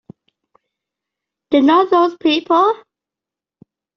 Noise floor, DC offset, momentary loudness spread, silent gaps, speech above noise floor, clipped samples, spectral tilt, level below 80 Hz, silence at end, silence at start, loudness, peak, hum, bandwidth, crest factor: -87 dBFS; under 0.1%; 6 LU; none; 74 dB; under 0.1%; -1.5 dB/octave; -64 dBFS; 1.2 s; 1.5 s; -14 LUFS; -2 dBFS; none; 6.4 kHz; 16 dB